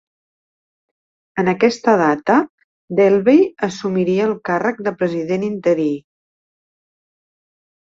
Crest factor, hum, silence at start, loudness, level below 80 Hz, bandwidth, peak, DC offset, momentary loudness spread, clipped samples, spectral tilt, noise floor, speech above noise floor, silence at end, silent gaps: 16 dB; none; 1.35 s; -17 LUFS; -62 dBFS; 7.8 kHz; -2 dBFS; under 0.1%; 9 LU; under 0.1%; -6.5 dB/octave; under -90 dBFS; over 74 dB; 1.9 s; 2.50-2.58 s, 2.64-2.88 s